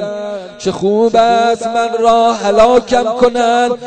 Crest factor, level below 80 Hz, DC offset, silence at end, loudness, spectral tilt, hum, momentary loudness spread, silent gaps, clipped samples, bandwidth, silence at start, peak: 12 dB; -42 dBFS; under 0.1%; 0 s; -12 LUFS; -4.5 dB/octave; none; 11 LU; none; under 0.1%; 9.2 kHz; 0 s; 0 dBFS